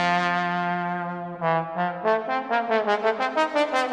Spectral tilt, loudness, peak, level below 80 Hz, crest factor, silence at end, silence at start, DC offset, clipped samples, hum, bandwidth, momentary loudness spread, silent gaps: -5.5 dB/octave; -24 LUFS; -8 dBFS; -72 dBFS; 16 dB; 0 s; 0 s; under 0.1%; under 0.1%; none; 11 kHz; 6 LU; none